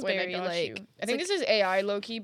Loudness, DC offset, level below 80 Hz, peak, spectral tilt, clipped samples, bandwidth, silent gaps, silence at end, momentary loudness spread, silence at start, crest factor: -28 LUFS; under 0.1%; -80 dBFS; -12 dBFS; -3.5 dB/octave; under 0.1%; 14.5 kHz; none; 0 s; 8 LU; 0 s; 18 dB